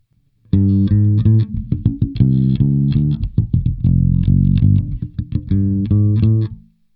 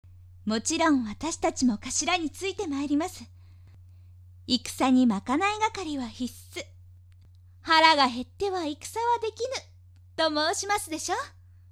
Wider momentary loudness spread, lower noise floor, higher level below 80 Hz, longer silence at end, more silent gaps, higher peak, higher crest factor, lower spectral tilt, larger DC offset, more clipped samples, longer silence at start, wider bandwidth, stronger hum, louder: second, 6 LU vs 15 LU; about the same, -55 dBFS vs -53 dBFS; first, -28 dBFS vs -56 dBFS; about the same, 0.35 s vs 0.4 s; neither; about the same, 0 dBFS vs -2 dBFS; second, 14 dB vs 26 dB; first, -13.5 dB/octave vs -3 dB/octave; neither; neither; first, 0.55 s vs 0.1 s; second, 4.5 kHz vs 15.5 kHz; neither; first, -16 LUFS vs -26 LUFS